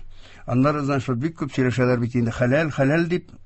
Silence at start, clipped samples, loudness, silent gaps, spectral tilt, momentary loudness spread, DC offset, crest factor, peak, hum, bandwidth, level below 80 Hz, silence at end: 0 s; under 0.1%; -22 LUFS; none; -7.5 dB/octave; 6 LU; under 0.1%; 14 dB; -6 dBFS; none; 8.4 kHz; -46 dBFS; 0 s